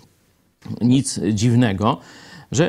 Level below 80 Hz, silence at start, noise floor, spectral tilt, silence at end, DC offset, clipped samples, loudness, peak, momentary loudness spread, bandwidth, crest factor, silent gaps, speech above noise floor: -54 dBFS; 0.7 s; -60 dBFS; -6 dB/octave; 0 s; under 0.1%; under 0.1%; -19 LUFS; -4 dBFS; 10 LU; 13.5 kHz; 16 dB; none; 42 dB